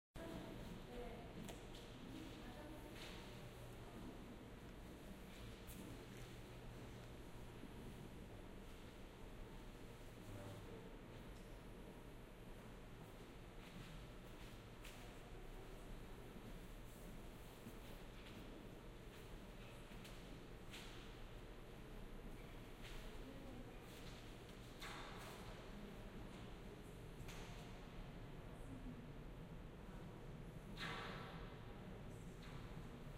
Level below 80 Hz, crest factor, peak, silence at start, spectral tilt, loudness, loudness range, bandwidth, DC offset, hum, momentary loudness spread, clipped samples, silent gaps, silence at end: -60 dBFS; 18 dB; -36 dBFS; 0.15 s; -5 dB/octave; -57 LUFS; 4 LU; 16 kHz; under 0.1%; none; 4 LU; under 0.1%; none; 0 s